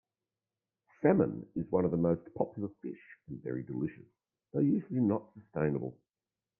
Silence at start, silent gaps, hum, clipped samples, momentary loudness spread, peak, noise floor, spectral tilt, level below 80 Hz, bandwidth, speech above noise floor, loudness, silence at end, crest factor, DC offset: 1 s; none; none; under 0.1%; 15 LU; -12 dBFS; under -90 dBFS; -13 dB/octave; -66 dBFS; 2.9 kHz; over 57 dB; -33 LUFS; 0.65 s; 22 dB; under 0.1%